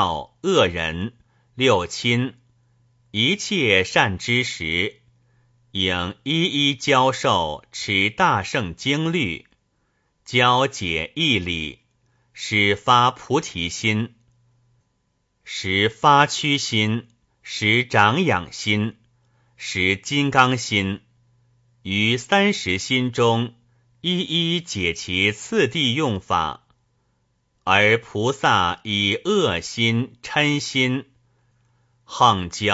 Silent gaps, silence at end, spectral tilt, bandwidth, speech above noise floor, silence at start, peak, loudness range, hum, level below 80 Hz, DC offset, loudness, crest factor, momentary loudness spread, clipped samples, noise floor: none; 0 s; -4 dB/octave; 8 kHz; 49 dB; 0 s; 0 dBFS; 2 LU; none; -52 dBFS; under 0.1%; -20 LUFS; 22 dB; 11 LU; under 0.1%; -70 dBFS